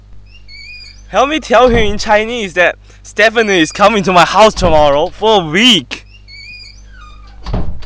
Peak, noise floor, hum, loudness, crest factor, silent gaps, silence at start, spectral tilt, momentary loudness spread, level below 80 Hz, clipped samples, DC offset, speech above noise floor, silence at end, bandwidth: 0 dBFS; -34 dBFS; 50 Hz at -35 dBFS; -10 LUFS; 12 dB; none; 0.1 s; -4 dB/octave; 22 LU; -28 dBFS; 0.5%; under 0.1%; 24 dB; 0 s; 8 kHz